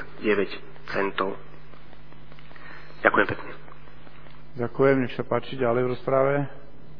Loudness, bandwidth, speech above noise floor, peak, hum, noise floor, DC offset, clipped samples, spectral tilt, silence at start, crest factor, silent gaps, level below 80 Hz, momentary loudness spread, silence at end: -25 LUFS; 5.4 kHz; 24 dB; -2 dBFS; none; -48 dBFS; 2%; under 0.1%; -8.5 dB/octave; 0 s; 26 dB; none; -54 dBFS; 22 LU; 0.05 s